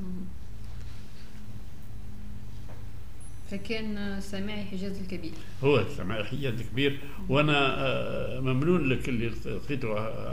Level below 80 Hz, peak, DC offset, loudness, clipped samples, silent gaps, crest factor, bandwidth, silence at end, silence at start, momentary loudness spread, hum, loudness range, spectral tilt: -46 dBFS; -10 dBFS; 3%; -30 LUFS; under 0.1%; none; 20 dB; 15.5 kHz; 0 s; 0 s; 20 LU; none; 15 LU; -6.5 dB/octave